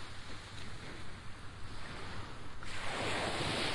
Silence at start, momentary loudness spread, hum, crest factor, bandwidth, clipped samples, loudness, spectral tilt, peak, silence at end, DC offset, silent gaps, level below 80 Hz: 0 s; 14 LU; none; 16 dB; 11.5 kHz; under 0.1%; -42 LUFS; -3.5 dB/octave; -22 dBFS; 0 s; under 0.1%; none; -54 dBFS